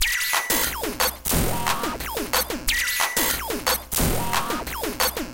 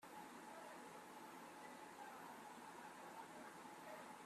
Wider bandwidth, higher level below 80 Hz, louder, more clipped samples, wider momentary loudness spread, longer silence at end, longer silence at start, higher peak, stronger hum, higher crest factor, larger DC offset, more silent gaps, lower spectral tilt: first, 17.5 kHz vs 15.5 kHz; first, -36 dBFS vs under -90 dBFS; first, -23 LUFS vs -57 LUFS; neither; first, 6 LU vs 1 LU; about the same, 0 s vs 0 s; about the same, 0 s vs 0 s; first, -6 dBFS vs -44 dBFS; neither; about the same, 18 dB vs 14 dB; neither; neither; about the same, -2 dB/octave vs -3 dB/octave